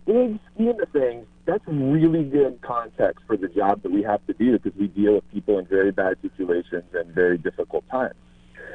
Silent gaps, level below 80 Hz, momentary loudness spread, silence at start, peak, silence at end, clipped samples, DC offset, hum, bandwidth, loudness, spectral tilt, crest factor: none; -54 dBFS; 8 LU; 0.05 s; -6 dBFS; 0 s; under 0.1%; under 0.1%; none; 4 kHz; -23 LUFS; -9.5 dB/octave; 18 dB